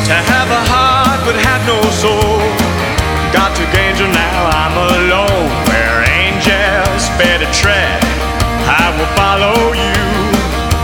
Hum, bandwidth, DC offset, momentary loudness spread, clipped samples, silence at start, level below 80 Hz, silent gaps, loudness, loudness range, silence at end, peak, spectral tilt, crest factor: none; 20 kHz; under 0.1%; 4 LU; under 0.1%; 0 s; -22 dBFS; none; -11 LUFS; 1 LU; 0 s; 0 dBFS; -4 dB/octave; 12 dB